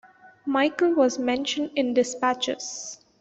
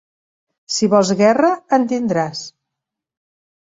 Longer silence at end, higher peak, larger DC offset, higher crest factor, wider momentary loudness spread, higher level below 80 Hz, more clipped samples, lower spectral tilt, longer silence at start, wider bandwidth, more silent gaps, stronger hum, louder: second, 0.25 s vs 1.2 s; second, -8 dBFS vs -2 dBFS; neither; about the same, 18 dB vs 16 dB; about the same, 12 LU vs 11 LU; about the same, -68 dBFS vs -64 dBFS; neither; second, -2.5 dB/octave vs -5 dB/octave; second, 0.25 s vs 0.7 s; about the same, 8.2 kHz vs 7.8 kHz; neither; neither; second, -24 LUFS vs -16 LUFS